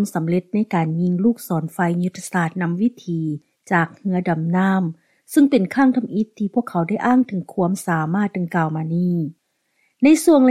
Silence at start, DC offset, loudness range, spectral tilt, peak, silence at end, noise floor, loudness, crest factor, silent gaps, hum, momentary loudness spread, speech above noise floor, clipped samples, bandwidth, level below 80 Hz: 0 s; under 0.1%; 3 LU; -7 dB/octave; -4 dBFS; 0 s; -67 dBFS; -20 LUFS; 16 dB; none; none; 8 LU; 48 dB; under 0.1%; 14.5 kHz; -64 dBFS